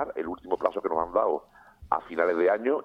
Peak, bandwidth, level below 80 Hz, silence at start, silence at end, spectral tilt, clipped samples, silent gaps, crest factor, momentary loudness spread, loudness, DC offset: -8 dBFS; 5.8 kHz; -58 dBFS; 0 s; 0 s; -7 dB/octave; under 0.1%; none; 20 dB; 8 LU; -27 LUFS; under 0.1%